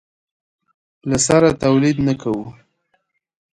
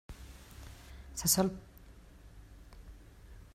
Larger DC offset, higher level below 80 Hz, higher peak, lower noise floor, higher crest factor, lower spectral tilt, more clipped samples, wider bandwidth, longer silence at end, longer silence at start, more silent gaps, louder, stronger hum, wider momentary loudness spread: neither; first, -46 dBFS vs -52 dBFS; first, 0 dBFS vs -14 dBFS; first, -68 dBFS vs -55 dBFS; second, 20 dB vs 26 dB; first, -5 dB/octave vs -3.5 dB/octave; neither; second, 11.5 kHz vs 16 kHz; first, 1 s vs 0.05 s; first, 1.05 s vs 0.1 s; neither; first, -17 LUFS vs -31 LUFS; neither; second, 14 LU vs 28 LU